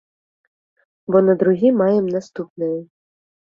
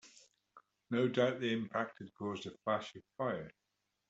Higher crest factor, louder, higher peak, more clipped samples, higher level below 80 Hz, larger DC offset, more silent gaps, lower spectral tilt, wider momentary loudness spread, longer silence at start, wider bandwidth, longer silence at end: about the same, 16 dB vs 20 dB; first, -18 LUFS vs -38 LUFS; first, -2 dBFS vs -18 dBFS; neither; first, -66 dBFS vs -78 dBFS; neither; first, 2.50-2.56 s vs none; first, -9 dB/octave vs -6 dB/octave; first, 14 LU vs 11 LU; first, 1.1 s vs 0.05 s; second, 7.2 kHz vs 8 kHz; about the same, 0.65 s vs 0.6 s